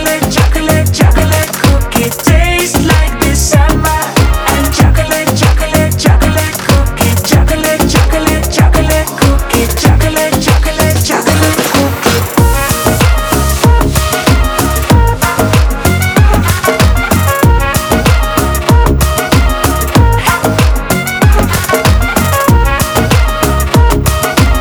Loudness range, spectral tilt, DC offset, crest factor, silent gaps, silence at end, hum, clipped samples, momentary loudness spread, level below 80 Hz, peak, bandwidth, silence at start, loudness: 0 LU; -5 dB/octave; under 0.1%; 8 dB; none; 0 s; none; 0.4%; 3 LU; -14 dBFS; 0 dBFS; over 20 kHz; 0 s; -10 LUFS